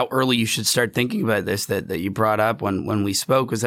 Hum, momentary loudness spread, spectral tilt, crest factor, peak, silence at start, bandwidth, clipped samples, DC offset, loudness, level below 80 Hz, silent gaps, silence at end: none; 5 LU; -4 dB/octave; 16 dB; -4 dBFS; 0 s; 18 kHz; under 0.1%; under 0.1%; -21 LUFS; -58 dBFS; none; 0 s